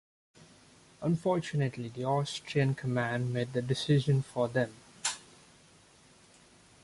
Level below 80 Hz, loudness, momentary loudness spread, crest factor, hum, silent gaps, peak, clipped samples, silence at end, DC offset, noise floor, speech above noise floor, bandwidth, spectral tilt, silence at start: -64 dBFS; -32 LUFS; 7 LU; 18 dB; none; none; -16 dBFS; under 0.1%; 1.65 s; under 0.1%; -60 dBFS; 30 dB; 11.5 kHz; -5.5 dB/octave; 0.4 s